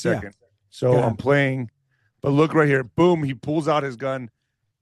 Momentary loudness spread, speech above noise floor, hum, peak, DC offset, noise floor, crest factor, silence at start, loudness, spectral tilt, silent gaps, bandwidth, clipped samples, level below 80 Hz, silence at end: 12 LU; 48 dB; none; -4 dBFS; under 0.1%; -68 dBFS; 18 dB; 0 s; -21 LUFS; -7.5 dB/octave; none; 11.5 kHz; under 0.1%; -56 dBFS; 0.55 s